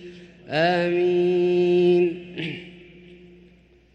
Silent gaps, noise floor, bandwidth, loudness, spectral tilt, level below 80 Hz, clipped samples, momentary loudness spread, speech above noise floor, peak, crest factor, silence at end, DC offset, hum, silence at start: none; -54 dBFS; 6.4 kHz; -21 LUFS; -7.5 dB/octave; -62 dBFS; under 0.1%; 14 LU; 34 dB; -8 dBFS; 14 dB; 0.8 s; under 0.1%; none; 0 s